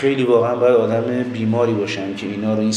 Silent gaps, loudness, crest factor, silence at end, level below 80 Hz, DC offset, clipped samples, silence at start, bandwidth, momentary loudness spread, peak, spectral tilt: none; -18 LUFS; 14 dB; 0 s; -64 dBFS; under 0.1%; under 0.1%; 0 s; 10 kHz; 8 LU; -4 dBFS; -6 dB/octave